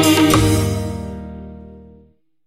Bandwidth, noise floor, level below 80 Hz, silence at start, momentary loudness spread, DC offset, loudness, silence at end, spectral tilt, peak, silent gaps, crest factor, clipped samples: 16 kHz; -52 dBFS; -34 dBFS; 0 s; 23 LU; under 0.1%; -16 LUFS; 0.65 s; -5 dB/octave; 0 dBFS; none; 18 dB; under 0.1%